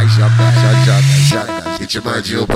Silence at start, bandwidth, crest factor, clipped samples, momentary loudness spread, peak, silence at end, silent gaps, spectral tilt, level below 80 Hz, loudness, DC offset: 0 s; 14 kHz; 10 dB; under 0.1%; 9 LU; 0 dBFS; 0 s; none; -5.5 dB/octave; -44 dBFS; -12 LUFS; under 0.1%